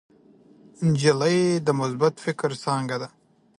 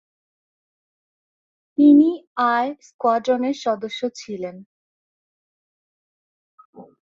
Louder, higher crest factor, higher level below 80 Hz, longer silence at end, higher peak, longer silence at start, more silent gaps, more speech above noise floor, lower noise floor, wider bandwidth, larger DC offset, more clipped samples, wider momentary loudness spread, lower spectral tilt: second, -23 LUFS vs -19 LUFS; about the same, 18 dB vs 18 dB; first, -62 dBFS vs -70 dBFS; first, 0.5 s vs 0.3 s; about the same, -6 dBFS vs -4 dBFS; second, 0.8 s vs 1.8 s; second, none vs 2.27-2.36 s, 2.94-2.99 s, 4.66-6.58 s, 6.65-6.73 s; second, 31 dB vs over 71 dB; second, -54 dBFS vs under -90 dBFS; first, 11.5 kHz vs 7.4 kHz; neither; neither; second, 9 LU vs 18 LU; about the same, -6 dB/octave vs -5.5 dB/octave